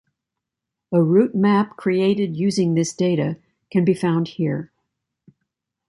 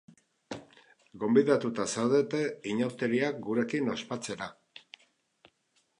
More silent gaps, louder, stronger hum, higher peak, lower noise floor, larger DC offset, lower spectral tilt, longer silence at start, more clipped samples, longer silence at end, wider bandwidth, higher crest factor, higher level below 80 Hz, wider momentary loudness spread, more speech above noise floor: neither; first, -20 LUFS vs -30 LUFS; neither; first, -4 dBFS vs -10 dBFS; first, -84 dBFS vs -73 dBFS; neither; first, -7 dB/octave vs -5 dB/octave; first, 0.9 s vs 0.5 s; neither; second, 1.25 s vs 1.45 s; about the same, 11.5 kHz vs 11 kHz; about the same, 16 dB vs 20 dB; first, -64 dBFS vs -74 dBFS; second, 8 LU vs 19 LU; first, 65 dB vs 44 dB